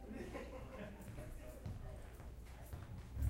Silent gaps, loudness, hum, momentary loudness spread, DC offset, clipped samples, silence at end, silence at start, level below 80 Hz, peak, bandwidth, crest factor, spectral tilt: none; -52 LUFS; none; 6 LU; under 0.1%; under 0.1%; 0 s; 0 s; -52 dBFS; -28 dBFS; 16 kHz; 20 dB; -7 dB/octave